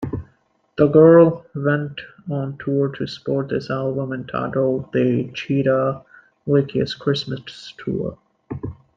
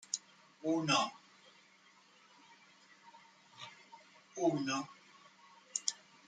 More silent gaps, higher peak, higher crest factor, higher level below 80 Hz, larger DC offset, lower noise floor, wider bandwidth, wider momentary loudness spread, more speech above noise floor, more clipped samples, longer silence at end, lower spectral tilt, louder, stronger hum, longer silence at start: neither; first, -2 dBFS vs -16 dBFS; second, 18 dB vs 26 dB; first, -52 dBFS vs -86 dBFS; neither; second, -60 dBFS vs -65 dBFS; second, 7.6 kHz vs 9.8 kHz; second, 18 LU vs 27 LU; first, 41 dB vs 31 dB; neither; about the same, 0.2 s vs 0.3 s; first, -8 dB/octave vs -3 dB/octave; first, -20 LUFS vs -36 LUFS; neither; second, 0 s vs 0.15 s